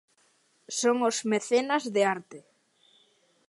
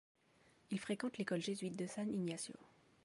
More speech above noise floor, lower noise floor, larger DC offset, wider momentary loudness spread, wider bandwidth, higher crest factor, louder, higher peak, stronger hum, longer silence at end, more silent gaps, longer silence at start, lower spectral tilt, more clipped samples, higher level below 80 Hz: first, 40 dB vs 29 dB; second, -67 dBFS vs -72 dBFS; neither; about the same, 6 LU vs 6 LU; about the same, 11.5 kHz vs 11.5 kHz; about the same, 18 dB vs 16 dB; first, -27 LUFS vs -43 LUFS; first, -12 dBFS vs -28 dBFS; neither; first, 1.1 s vs 0.4 s; neither; about the same, 0.7 s vs 0.7 s; second, -3 dB/octave vs -5 dB/octave; neither; about the same, -84 dBFS vs -82 dBFS